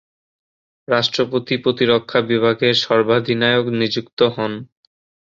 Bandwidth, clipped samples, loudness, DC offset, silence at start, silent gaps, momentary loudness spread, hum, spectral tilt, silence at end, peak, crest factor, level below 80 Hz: 7.6 kHz; under 0.1%; -17 LUFS; under 0.1%; 0.9 s; 4.13-4.17 s; 5 LU; none; -5.5 dB/octave; 0.6 s; -2 dBFS; 18 dB; -60 dBFS